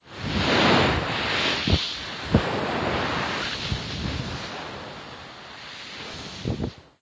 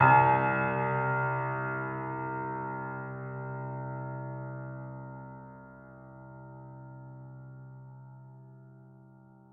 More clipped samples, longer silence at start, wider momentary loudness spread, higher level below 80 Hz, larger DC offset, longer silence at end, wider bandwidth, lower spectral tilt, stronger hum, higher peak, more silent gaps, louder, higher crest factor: neither; about the same, 0.05 s vs 0 s; second, 17 LU vs 22 LU; first, -38 dBFS vs -66 dBFS; neither; second, 0.2 s vs 0.55 s; first, 8 kHz vs 3.7 kHz; second, -5 dB/octave vs -10.5 dB/octave; neither; first, -4 dBFS vs -8 dBFS; neither; first, -25 LUFS vs -31 LUFS; about the same, 22 dB vs 24 dB